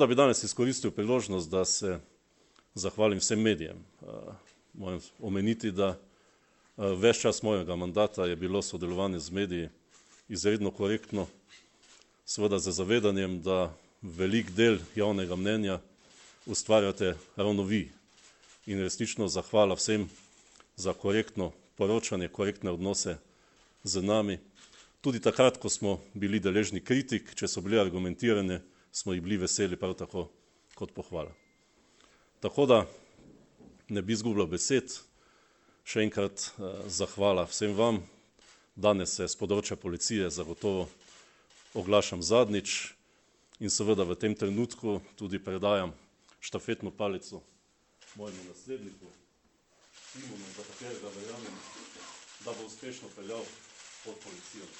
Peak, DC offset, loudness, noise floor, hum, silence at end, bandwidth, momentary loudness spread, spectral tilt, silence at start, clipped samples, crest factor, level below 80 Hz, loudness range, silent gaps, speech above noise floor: -8 dBFS; under 0.1%; -30 LUFS; -69 dBFS; none; 0 s; 8.6 kHz; 19 LU; -4 dB/octave; 0 s; under 0.1%; 22 dB; -62 dBFS; 11 LU; none; 39 dB